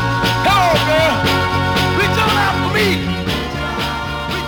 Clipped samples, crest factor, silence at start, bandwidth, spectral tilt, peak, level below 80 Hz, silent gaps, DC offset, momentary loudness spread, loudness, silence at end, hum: under 0.1%; 14 dB; 0 s; over 20 kHz; -5 dB/octave; -2 dBFS; -32 dBFS; none; under 0.1%; 7 LU; -15 LUFS; 0 s; none